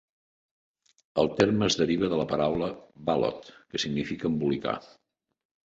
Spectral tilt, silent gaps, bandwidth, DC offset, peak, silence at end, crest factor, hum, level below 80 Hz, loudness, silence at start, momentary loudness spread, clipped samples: -5 dB/octave; none; 8 kHz; under 0.1%; -8 dBFS; 0.9 s; 22 dB; none; -56 dBFS; -28 LUFS; 1.15 s; 11 LU; under 0.1%